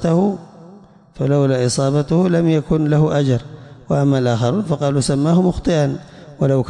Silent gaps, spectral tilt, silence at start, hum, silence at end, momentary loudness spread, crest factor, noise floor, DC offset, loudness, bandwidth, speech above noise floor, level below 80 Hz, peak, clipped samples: none; -7 dB/octave; 0 s; none; 0 s; 7 LU; 12 dB; -43 dBFS; under 0.1%; -17 LUFS; 11 kHz; 28 dB; -42 dBFS; -6 dBFS; under 0.1%